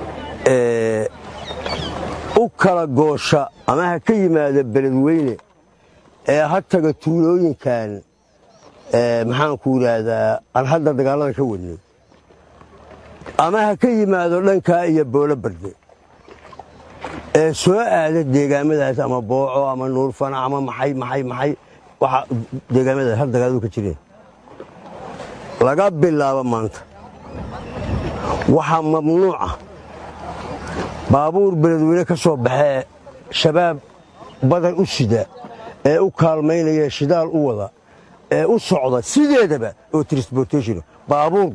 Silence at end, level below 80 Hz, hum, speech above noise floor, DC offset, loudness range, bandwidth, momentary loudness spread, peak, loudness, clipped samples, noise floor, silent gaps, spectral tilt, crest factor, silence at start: 0 s; -44 dBFS; none; 36 dB; under 0.1%; 3 LU; 11 kHz; 15 LU; 0 dBFS; -18 LUFS; under 0.1%; -53 dBFS; none; -6.5 dB/octave; 18 dB; 0 s